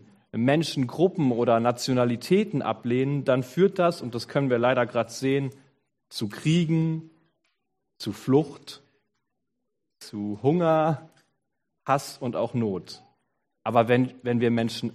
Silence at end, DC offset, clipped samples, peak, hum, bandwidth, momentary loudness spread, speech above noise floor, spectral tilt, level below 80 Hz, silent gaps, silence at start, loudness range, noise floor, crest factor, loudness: 0.05 s; under 0.1%; under 0.1%; -6 dBFS; none; 13.5 kHz; 13 LU; 57 dB; -6.5 dB/octave; -68 dBFS; none; 0.35 s; 5 LU; -82 dBFS; 20 dB; -25 LUFS